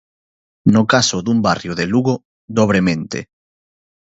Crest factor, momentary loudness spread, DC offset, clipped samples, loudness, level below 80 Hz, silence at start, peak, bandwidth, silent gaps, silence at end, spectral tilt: 18 dB; 10 LU; under 0.1%; under 0.1%; -16 LUFS; -48 dBFS; 0.65 s; 0 dBFS; 8 kHz; 2.25-2.48 s; 0.9 s; -5 dB/octave